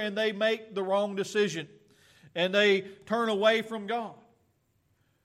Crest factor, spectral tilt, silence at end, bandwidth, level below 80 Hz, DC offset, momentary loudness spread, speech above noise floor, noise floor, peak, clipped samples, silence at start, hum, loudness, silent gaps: 18 dB; -4 dB/octave; 1.1 s; 13.5 kHz; -80 dBFS; under 0.1%; 12 LU; 43 dB; -71 dBFS; -12 dBFS; under 0.1%; 0 s; none; -28 LUFS; none